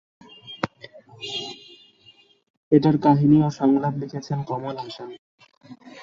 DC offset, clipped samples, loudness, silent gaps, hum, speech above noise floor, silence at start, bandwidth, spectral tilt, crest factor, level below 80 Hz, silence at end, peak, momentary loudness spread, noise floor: under 0.1%; under 0.1%; -22 LUFS; 2.50-2.71 s, 5.19-5.38 s, 5.57-5.61 s; none; 34 dB; 0.45 s; 7.4 kHz; -7.5 dB/octave; 22 dB; -60 dBFS; 0 s; -2 dBFS; 21 LU; -55 dBFS